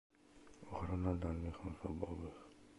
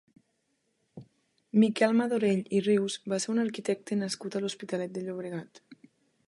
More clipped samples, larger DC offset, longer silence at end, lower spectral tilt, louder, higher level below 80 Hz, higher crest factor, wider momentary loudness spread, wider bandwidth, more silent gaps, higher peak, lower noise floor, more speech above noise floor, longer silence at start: neither; neither; second, 0 s vs 0.55 s; first, -8.5 dB/octave vs -5.5 dB/octave; second, -44 LUFS vs -29 LUFS; first, -52 dBFS vs -78 dBFS; about the same, 20 dB vs 20 dB; first, 20 LU vs 11 LU; about the same, 11 kHz vs 11.5 kHz; neither; second, -24 dBFS vs -12 dBFS; second, -63 dBFS vs -76 dBFS; second, 20 dB vs 48 dB; second, 0.1 s vs 0.95 s